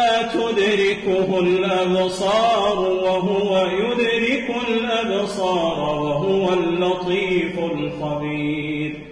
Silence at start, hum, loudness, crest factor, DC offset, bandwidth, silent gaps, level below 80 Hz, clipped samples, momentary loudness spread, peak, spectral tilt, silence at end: 0 s; none; -20 LUFS; 12 dB; under 0.1%; 10.5 kHz; none; -50 dBFS; under 0.1%; 6 LU; -8 dBFS; -5.5 dB/octave; 0 s